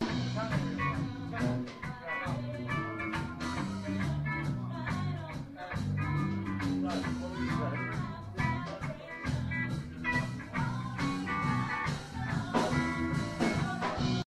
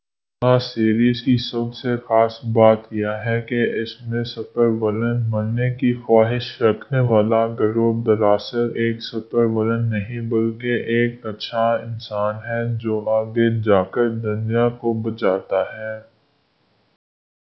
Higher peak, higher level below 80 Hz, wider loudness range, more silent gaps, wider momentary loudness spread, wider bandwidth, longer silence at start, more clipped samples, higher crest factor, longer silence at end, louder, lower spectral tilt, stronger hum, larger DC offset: second, -16 dBFS vs 0 dBFS; about the same, -50 dBFS vs -54 dBFS; about the same, 3 LU vs 3 LU; neither; about the same, 6 LU vs 8 LU; first, 12.5 kHz vs 6 kHz; second, 0 s vs 0.4 s; neither; about the same, 18 dB vs 20 dB; second, 0.05 s vs 1.55 s; second, -34 LUFS vs -20 LUFS; second, -6.5 dB/octave vs -9 dB/octave; neither; neither